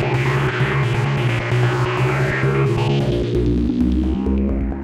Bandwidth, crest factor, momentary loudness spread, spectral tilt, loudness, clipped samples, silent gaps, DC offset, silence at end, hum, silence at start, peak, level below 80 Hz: 11 kHz; 12 dB; 2 LU; -7.5 dB/octave; -19 LUFS; under 0.1%; none; under 0.1%; 0 s; none; 0 s; -6 dBFS; -28 dBFS